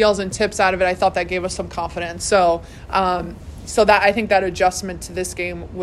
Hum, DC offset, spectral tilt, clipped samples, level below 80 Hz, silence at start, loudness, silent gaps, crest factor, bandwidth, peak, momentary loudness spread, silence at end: none; under 0.1%; -3.5 dB/octave; under 0.1%; -40 dBFS; 0 s; -19 LUFS; none; 18 dB; 13.5 kHz; 0 dBFS; 11 LU; 0 s